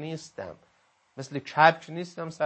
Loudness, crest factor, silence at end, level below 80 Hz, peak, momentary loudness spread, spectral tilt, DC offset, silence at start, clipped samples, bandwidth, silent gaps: -26 LUFS; 24 dB; 0 s; -74 dBFS; -4 dBFS; 21 LU; -5 dB/octave; under 0.1%; 0 s; under 0.1%; 8.6 kHz; none